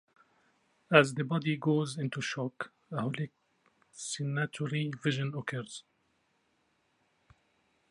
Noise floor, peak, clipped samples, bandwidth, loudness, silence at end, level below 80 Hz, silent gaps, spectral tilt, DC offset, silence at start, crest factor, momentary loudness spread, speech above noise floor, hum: -74 dBFS; -4 dBFS; under 0.1%; 11.5 kHz; -32 LUFS; 2.1 s; -78 dBFS; none; -5.5 dB/octave; under 0.1%; 0.9 s; 30 dB; 16 LU; 43 dB; none